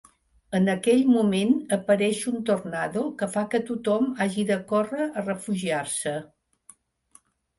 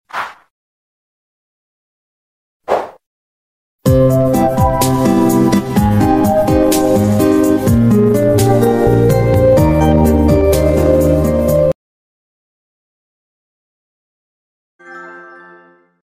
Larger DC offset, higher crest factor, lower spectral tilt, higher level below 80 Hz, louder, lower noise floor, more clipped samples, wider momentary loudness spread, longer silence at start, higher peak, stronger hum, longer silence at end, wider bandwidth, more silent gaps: neither; about the same, 18 dB vs 14 dB; second, -5.5 dB/octave vs -7 dB/octave; second, -64 dBFS vs -26 dBFS; second, -25 LUFS vs -12 LUFS; first, -59 dBFS vs -45 dBFS; neither; about the same, 8 LU vs 8 LU; first, 0.5 s vs 0.15 s; second, -8 dBFS vs 0 dBFS; neither; first, 1.35 s vs 0.8 s; second, 11.5 kHz vs 16 kHz; second, none vs 0.50-2.60 s, 3.06-3.79 s, 11.75-14.79 s